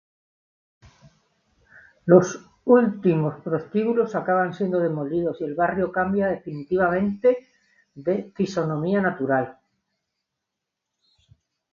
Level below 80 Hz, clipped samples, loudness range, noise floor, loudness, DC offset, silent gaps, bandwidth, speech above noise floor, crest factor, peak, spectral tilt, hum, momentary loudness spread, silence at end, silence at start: -60 dBFS; under 0.1%; 6 LU; -83 dBFS; -23 LUFS; under 0.1%; none; 7.2 kHz; 61 dB; 22 dB; -2 dBFS; -7.5 dB/octave; none; 11 LU; 2.2 s; 2.05 s